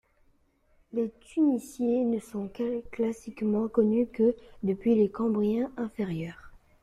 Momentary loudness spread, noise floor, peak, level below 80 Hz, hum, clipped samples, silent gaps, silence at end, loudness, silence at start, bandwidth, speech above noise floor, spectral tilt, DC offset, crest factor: 8 LU; -66 dBFS; -12 dBFS; -60 dBFS; none; under 0.1%; none; 0.25 s; -29 LUFS; 0.95 s; 13 kHz; 38 dB; -8 dB/octave; under 0.1%; 16 dB